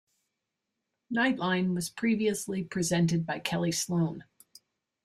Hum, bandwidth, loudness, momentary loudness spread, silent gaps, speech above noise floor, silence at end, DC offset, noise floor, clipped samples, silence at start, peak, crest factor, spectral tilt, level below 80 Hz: none; 15 kHz; -29 LUFS; 6 LU; none; 56 dB; 0.85 s; under 0.1%; -85 dBFS; under 0.1%; 1.1 s; -12 dBFS; 20 dB; -5 dB/octave; -66 dBFS